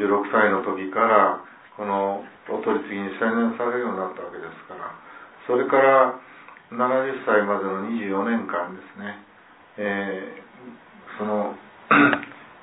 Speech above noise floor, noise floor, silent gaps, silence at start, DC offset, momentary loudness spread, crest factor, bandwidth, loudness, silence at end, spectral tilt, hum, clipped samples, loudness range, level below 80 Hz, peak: 22 dB; -45 dBFS; none; 0 s; under 0.1%; 20 LU; 22 dB; 4 kHz; -22 LUFS; 0.1 s; -9.5 dB/octave; none; under 0.1%; 7 LU; -74 dBFS; -2 dBFS